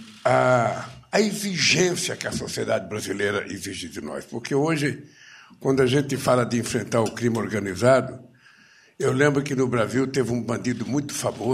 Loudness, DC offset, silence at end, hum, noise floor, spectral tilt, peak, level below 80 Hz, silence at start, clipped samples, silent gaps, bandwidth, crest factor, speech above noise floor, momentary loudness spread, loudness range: -23 LUFS; under 0.1%; 0 s; none; -54 dBFS; -4.5 dB/octave; -6 dBFS; -58 dBFS; 0 s; under 0.1%; none; 15.5 kHz; 18 dB; 31 dB; 12 LU; 4 LU